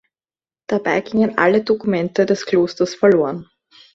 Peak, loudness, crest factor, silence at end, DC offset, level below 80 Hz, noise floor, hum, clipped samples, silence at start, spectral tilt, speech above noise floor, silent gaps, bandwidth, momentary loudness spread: 0 dBFS; -17 LUFS; 18 dB; 0.5 s; under 0.1%; -60 dBFS; under -90 dBFS; none; under 0.1%; 0.7 s; -6 dB/octave; over 73 dB; none; 7.6 kHz; 7 LU